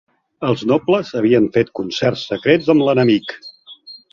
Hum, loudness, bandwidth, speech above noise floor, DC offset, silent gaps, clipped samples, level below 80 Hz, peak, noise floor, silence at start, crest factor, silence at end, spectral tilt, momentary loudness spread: none; -16 LUFS; 7.2 kHz; 25 dB; under 0.1%; none; under 0.1%; -54 dBFS; 0 dBFS; -41 dBFS; 0.4 s; 16 dB; 0.15 s; -6.5 dB/octave; 19 LU